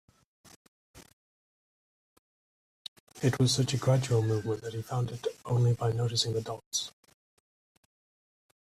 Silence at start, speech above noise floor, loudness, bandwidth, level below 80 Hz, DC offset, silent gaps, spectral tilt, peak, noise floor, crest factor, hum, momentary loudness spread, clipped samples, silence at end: 0.95 s; over 61 dB; -30 LUFS; 13.5 kHz; -64 dBFS; under 0.1%; 1.13-3.07 s, 6.66-6.71 s; -5 dB/octave; -12 dBFS; under -90 dBFS; 20 dB; none; 14 LU; under 0.1%; 1.9 s